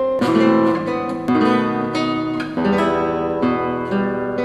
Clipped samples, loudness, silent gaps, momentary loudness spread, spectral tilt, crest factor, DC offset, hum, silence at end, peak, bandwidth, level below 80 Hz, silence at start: under 0.1%; -19 LUFS; none; 6 LU; -7 dB/octave; 16 dB; under 0.1%; none; 0 s; -2 dBFS; 11 kHz; -48 dBFS; 0 s